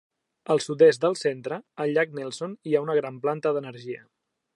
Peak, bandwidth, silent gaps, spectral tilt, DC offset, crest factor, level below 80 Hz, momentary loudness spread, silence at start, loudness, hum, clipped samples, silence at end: -6 dBFS; 11 kHz; none; -5.5 dB/octave; under 0.1%; 18 dB; -80 dBFS; 18 LU; 0.5 s; -25 LUFS; none; under 0.1%; 0.6 s